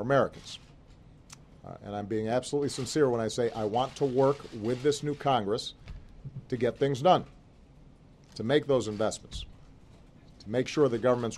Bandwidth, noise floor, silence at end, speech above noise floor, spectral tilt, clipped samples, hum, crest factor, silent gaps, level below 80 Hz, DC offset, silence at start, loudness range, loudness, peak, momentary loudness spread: 12.5 kHz; -55 dBFS; 0 s; 26 dB; -5.5 dB/octave; under 0.1%; none; 22 dB; none; -54 dBFS; under 0.1%; 0 s; 4 LU; -29 LUFS; -8 dBFS; 20 LU